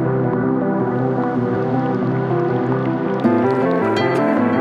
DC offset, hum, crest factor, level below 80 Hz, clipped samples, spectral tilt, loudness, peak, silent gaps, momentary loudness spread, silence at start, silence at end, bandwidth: under 0.1%; none; 14 dB; -56 dBFS; under 0.1%; -9 dB/octave; -18 LUFS; -2 dBFS; none; 3 LU; 0 s; 0 s; 8 kHz